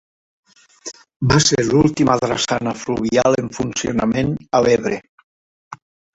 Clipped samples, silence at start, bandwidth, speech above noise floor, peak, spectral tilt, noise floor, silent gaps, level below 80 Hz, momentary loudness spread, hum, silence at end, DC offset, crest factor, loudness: under 0.1%; 0.85 s; 8.4 kHz; 21 dB; -2 dBFS; -4.5 dB/octave; -38 dBFS; 1.16-1.20 s, 5.09-5.18 s, 5.24-5.71 s; -44 dBFS; 13 LU; none; 0.4 s; under 0.1%; 18 dB; -17 LUFS